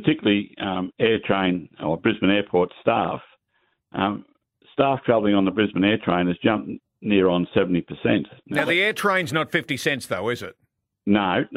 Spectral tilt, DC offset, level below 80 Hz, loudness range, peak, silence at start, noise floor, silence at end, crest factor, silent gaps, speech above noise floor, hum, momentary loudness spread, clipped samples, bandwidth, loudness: -6 dB/octave; under 0.1%; -58 dBFS; 2 LU; -4 dBFS; 0 s; -70 dBFS; 0 s; 18 dB; none; 48 dB; none; 8 LU; under 0.1%; 15 kHz; -22 LUFS